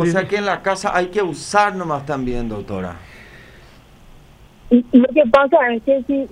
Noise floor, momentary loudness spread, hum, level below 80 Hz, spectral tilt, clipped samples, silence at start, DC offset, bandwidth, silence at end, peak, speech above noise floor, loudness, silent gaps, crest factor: -45 dBFS; 13 LU; none; -40 dBFS; -5.5 dB/octave; under 0.1%; 0 s; under 0.1%; 11 kHz; 0.05 s; 0 dBFS; 28 dB; -17 LUFS; none; 18 dB